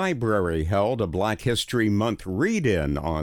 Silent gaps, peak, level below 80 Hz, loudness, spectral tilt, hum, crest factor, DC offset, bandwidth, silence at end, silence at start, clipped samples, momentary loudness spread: none; -10 dBFS; -40 dBFS; -24 LUFS; -6 dB/octave; none; 14 dB; under 0.1%; 19 kHz; 0 s; 0 s; under 0.1%; 3 LU